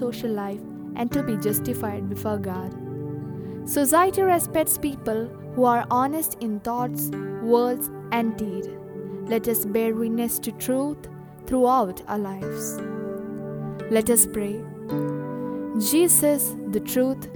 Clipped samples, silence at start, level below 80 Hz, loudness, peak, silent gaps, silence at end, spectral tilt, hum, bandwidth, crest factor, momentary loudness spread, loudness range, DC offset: under 0.1%; 0 s; -54 dBFS; -24 LUFS; -4 dBFS; none; 0 s; -4.5 dB/octave; none; over 20 kHz; 20 dB; 14 LU; 5 LU; under 0.1%